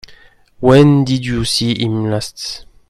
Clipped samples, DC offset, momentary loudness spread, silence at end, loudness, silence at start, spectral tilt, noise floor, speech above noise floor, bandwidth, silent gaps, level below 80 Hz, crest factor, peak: under 0.1%; under 0.1%; 14 LU; 0.3 s; -14 LUFS; 0.1 s; -6 dB/octave; -44 dBFS; 31 dB; 13 kHz; none; -40 dBFS; 14 dB; 0 dBFS